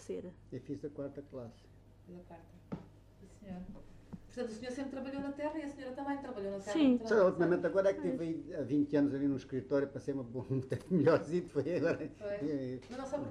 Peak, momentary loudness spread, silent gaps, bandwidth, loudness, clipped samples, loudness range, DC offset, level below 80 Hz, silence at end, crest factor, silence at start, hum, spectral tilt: -18 dBFS; 20 LU; none; 11 kHz; -35 LUFS; under 0.1%; 16 LU; under 0.1%; -64 dBFS; 0 s; 18 dB; 0 s; none; -7.5 dB/octave